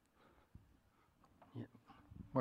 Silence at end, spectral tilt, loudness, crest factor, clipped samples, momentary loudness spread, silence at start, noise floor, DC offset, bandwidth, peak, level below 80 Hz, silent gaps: 0 s; -9.5 dB/octave; -51 LUFS; 28 dB; under 0.1%; 17 LU; 1.4 s; -73 dBFS; under 0.1%; 15 kHz; -22 dBFS; -72 dBFS; none